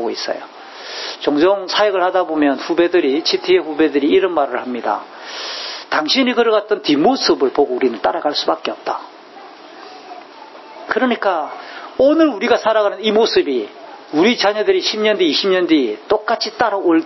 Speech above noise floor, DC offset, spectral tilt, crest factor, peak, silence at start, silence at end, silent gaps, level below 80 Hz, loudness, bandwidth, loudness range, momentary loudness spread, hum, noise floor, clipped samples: 22 dB; under 0.1%; -4 dB/octave; 16 dB; 0 dBFS; 0 s; 0 s; none; -60 dBFS; -16 LUFS; 6.2 kHz; 6 LU; 14 LU; none; -38 dBFS; under 0.1%